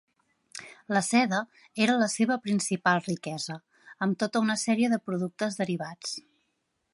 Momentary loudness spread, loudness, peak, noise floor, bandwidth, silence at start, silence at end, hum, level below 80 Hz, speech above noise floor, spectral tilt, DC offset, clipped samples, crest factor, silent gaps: 15 LU; -28 LUFS; -10 dBFS; -77 dBFS; 11.5 kHz; 0.55 s; 0.75 s; none; -76 dBFS; 50 dB; -4.5 dB/octave; under 0.1%; under 0.1%; 20 dB; none